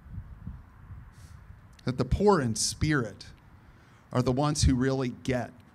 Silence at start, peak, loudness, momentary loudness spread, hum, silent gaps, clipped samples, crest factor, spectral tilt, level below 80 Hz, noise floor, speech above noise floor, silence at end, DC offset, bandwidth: 0.05 s; -10 dBFS; -28 LUFS; 24 LU; none; none; under 0.1%; 20 dB; -5 dB/octave; -42 dBFS; -55 dBFS; 28 dB; 0.15 s; under 0.1%; 14.5 kHz